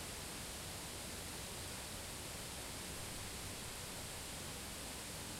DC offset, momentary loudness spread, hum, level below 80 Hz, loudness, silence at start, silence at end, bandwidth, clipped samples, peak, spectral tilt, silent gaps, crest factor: under 0.1%; 0 LU; none; -58 dBFS; -46 LUFS; 0 s; 0 s; 16 kHz; under 0.1%; -34 dBFS; -2.5 dB/octave; none; 14 dB